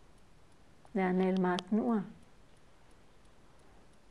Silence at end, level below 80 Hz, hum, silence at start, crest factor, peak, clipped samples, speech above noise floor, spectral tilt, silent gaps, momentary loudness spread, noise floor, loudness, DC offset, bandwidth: 1.95 s; -66 dBFS; none; 0.95 s; 20 dB; -16 dBFS; under 0.1%; 31 dB; -7.5 dB/octave; none; 8 LU; -62 dBFS; -32 LUFS; 0.1%; 11 kHz